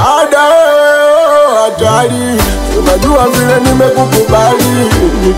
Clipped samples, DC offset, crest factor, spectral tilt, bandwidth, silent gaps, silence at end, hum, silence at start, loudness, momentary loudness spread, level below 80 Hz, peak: under 0.1%; under 0.1%; 8 dB; -4.5 dB/octave; 16.5 kHz; none; 0 s; none; 0 s; -8 LUFS; 5 LU; -20 dBFS; 0 dBFS